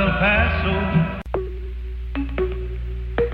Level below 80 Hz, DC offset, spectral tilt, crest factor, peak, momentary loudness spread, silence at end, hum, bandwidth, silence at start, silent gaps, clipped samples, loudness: -28 dBFS; under 0.1%; -9 dB/octave; 16 dB; -6 dBFS; 14 LU; 0 s; none; 5.2 kHz; 0 s; none; under 0.1%; -23 LUFS